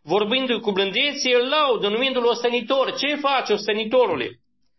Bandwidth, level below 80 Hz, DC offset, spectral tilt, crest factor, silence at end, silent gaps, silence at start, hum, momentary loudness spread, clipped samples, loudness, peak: 6.2 kHz; -66 dBFS; under 0.1%; -3.5 dB/octave; 14 dB; 0.45 s; none; 0.05 s; none; 4 LU; under 0.1%; -20 LUFS; -8 dBFS